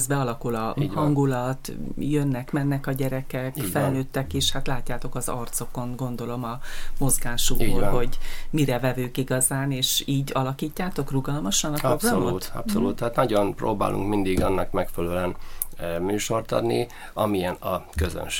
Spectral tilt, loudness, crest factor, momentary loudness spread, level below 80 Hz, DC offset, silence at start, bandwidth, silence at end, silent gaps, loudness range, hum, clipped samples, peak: -4.5 dB/octave; -26 LUFS; 24 dB; 8 LU; -32 dBFS; under 0.1%; 0 s; 17 kHz; 0 s; none; 3 LU; none; under 0.1%; 0 dBFS